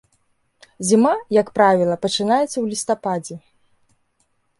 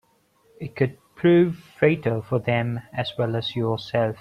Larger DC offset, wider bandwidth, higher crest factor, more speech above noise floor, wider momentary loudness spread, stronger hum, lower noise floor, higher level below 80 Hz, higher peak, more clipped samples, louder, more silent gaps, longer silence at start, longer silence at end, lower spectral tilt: neither; first, 11.5 kHz vs 6.8 kHz; about the same, 18 dB vs 20 dB; first, 48 dB vs 39 dB; about the same, 11 LU vs 10 LU; neither; first, -66 dBFS vs -62 dBFS; about the same, -64 dBFS vs -60 dBFS; about the same, -4 dBFS vs -4 dBFS; neither; first, -19 LUFS vs -23 LUFS; neither; first, 0.8 s vs 0.6 s; first, 1.2 s vs 0.05 s; second, -4.5 dB/octave vs -8 dB/octave